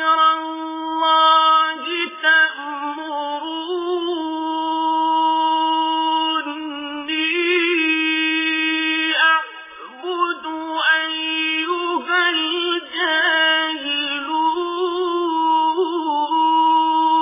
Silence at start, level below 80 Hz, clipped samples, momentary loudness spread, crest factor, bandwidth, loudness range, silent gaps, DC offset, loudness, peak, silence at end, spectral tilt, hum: 0 s; -68 dBFS; under 0.1%; 11 LU; 16 dB; 3.8 kHz; 3 LU; none; under 0.1%; -18 LUFS; -4 dBFS; 0 s; -4 dB/octave; none